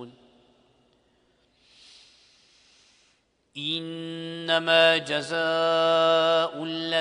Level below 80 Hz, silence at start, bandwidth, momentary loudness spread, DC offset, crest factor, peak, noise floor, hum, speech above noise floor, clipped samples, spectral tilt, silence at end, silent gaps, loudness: -74 dBFS; 0 s; 10.5 kHz; 16 LU; under 0.1%; 20 dB; -6 dBFS; -67 dBFS; none; 44 dB; under 0.1%; -4 dB/octave; 0 s; none; -23 LUFS